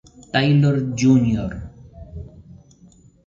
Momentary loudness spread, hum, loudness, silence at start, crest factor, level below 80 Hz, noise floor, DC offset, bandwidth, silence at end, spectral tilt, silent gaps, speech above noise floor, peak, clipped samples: 23 LU; none; -18 LUFS; 0.35 s; 16 dB; -42 dBFS; -50 dBFS; under 0.1%; 7.6 kHz; 0.85 s; -6.5 dB/octave; none; 33 dB; -4 dBFS; under 0.1%